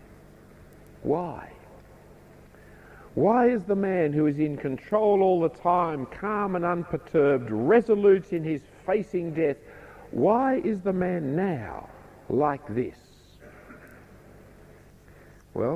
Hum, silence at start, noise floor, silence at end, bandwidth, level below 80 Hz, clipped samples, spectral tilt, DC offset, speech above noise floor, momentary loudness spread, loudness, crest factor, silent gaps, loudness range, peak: none; 1 s; -52 dBFS; 0 s; 10 kHz; -56 dBFS; under 0.1%; -9 dB/octave; under 0.1%; 27 dB; 15 LU; -25 LUFS; 20 dB; none; 9 LU; -8 dBFS